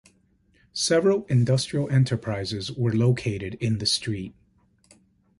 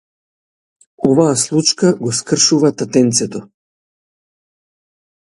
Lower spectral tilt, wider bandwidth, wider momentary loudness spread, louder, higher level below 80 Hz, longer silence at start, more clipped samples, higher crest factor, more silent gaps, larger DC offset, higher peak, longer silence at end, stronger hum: first, -5.5 dB/octave vs -4 dB/octave; about the same, 11.5 kHz vs 11.5 kHz; about the same, 9 LU vs 7 LU; second, -24 LUFS vs -14 LUFS; about the same, -54 dBFS vs -58 dBFS; second, 0.75 s vs 1 s; neither; about the same, 16 dB vs 18 dB; neither; neither; second, -10 dBFS vs 0 dBFS; second, 1.1 s vs 1.75 s; neither